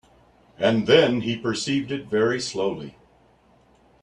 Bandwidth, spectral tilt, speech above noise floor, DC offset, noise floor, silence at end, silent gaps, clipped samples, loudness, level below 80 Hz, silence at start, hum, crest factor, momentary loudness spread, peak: 10.5 kHz; -5 dB/octave; 36 dB; under 0.1%; -58 dBFS; 1.1 s; none; under 0.1%; -22 LUFS; -60 dBFS; 0.6 s; none; 22 dB; 10 LU; -2 dBFS